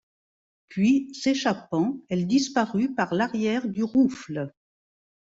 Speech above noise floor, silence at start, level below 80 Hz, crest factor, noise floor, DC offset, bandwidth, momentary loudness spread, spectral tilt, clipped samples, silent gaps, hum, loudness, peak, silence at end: over 66 dB; 0.7 s; -66 dBFS; 16 dB; under -90 dBFS; under 0.1%; 8 kHz; 11 LU; -5.5 dB/octave; under 0.1%; none; none; -25 LUFS; -10 dBFS; 0.8 s